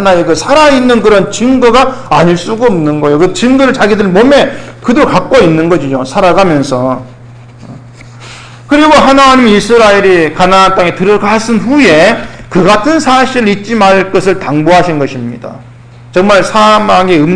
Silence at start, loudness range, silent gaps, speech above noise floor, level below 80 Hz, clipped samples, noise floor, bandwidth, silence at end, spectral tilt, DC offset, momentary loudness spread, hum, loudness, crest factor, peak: 0 s; 4 LU; none; 24 dB; -32 dBFS; 2%; -31 dBFS; 11 kHz; 0 s; -5 dB/octave; under 0.1%; 8 LU; none; -7 LUFS; 6 dB; 0 dBFS